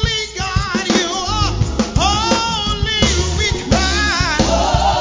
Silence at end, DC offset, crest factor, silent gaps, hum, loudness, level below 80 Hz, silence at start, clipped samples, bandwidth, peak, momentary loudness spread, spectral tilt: 0 s; under 0.1%; 14 dB; none; none; -16 LUFS; -24 dBFS; 0 s; under 0.1%; 7.6 kHz; -2 dBFS; 4 LU; -3.5 dB/octave